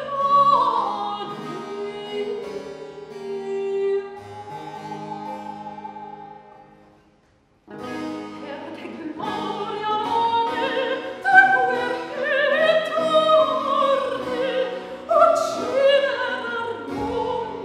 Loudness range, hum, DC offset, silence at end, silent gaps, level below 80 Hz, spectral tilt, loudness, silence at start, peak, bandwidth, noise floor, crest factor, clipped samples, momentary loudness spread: 18 LU; none; under 0.1%; 0 s; none; -60 dBFS; -4 dB/octave; -21 LUFS; 0 s; -2 dBFS; 13.5 kHz; -60 dBFS; 22 dB; under 0.1%; 18 LU